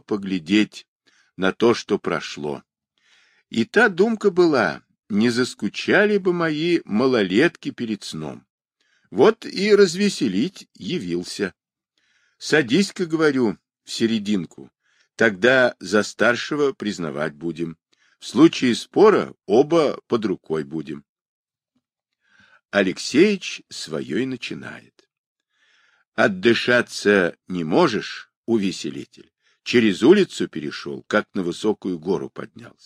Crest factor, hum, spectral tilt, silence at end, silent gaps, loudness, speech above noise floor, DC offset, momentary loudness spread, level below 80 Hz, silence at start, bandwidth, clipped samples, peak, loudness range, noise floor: 18 dB; none; -5 dB/octave; 0.15 s; 0.88-1.00 s, 8.50-8.58 s, 21.09-21.45 s, 25.18-25.36 s, 26.07-26.12 s, 28.36-28.44 s; -21 LUFS; 55 dB; under 0.1%; 15 LU; -64 dBFS; 0.1 s; 13 kHz; under 0.1%; -2 dBFS; 5 LU; -75 dBFS